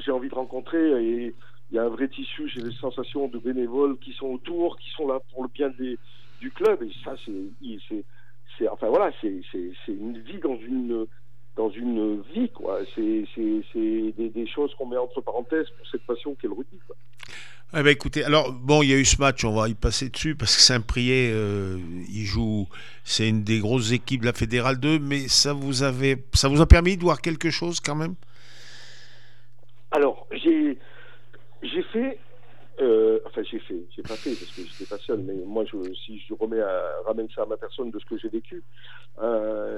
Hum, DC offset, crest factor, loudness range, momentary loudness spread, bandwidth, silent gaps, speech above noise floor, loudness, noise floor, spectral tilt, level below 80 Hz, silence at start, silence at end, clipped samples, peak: none; 2%; 26 dB; 10 LU; 17 LU; 13.5 kHz; none; 33 dB; -24 LUFS; -57 dBFS; -4.5 dB/octave; -36 dBFS; 0 s; 0 s; under 0.1%; 0 dBFS